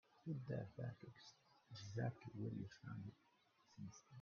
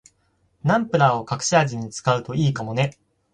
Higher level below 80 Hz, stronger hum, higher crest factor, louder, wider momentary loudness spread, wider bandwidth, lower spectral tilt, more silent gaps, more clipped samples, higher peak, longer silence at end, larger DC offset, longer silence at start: second, -80 dBFS vs -56 dBFS; neither; about the same, 20 dB vs 20 dB; second, -52 LUFS vs -22 LUFS; first, 14 LU vs 7 LU; second, 7 kHz vs 10.5 kHz; first, -7 dB/octave vs -5 dB/octave; neither; neither; second, -32 dBFS vs -4 dBFS; second, 0 s vs 0.45 s; neither; second, 0.15 s vs 0.65 s